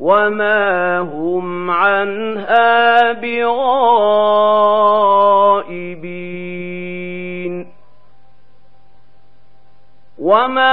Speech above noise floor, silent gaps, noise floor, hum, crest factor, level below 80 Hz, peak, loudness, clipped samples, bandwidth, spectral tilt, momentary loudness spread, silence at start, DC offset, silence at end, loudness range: 41 dB; none; -55 dBFS; none; 14 dB; -64 dBFS; 0 dBFS; -14 LUFS; under 0.1%; 5.2 kHz; -7.5 dB/octave; 15 LU; 0 s; 2%; 0 s; 17 LU